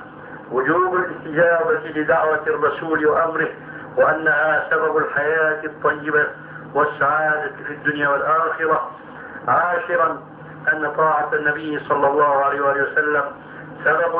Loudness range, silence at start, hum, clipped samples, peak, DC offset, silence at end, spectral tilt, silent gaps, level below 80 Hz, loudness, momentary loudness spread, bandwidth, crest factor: 2 LU; 0 s; none; under 0.1%; -4 dBFS; under 0.1%; 0 s; -9.5 dB/octave; none; -60 dBFS; -19 LUFS; 11 LU; 4 kHz; 16 dB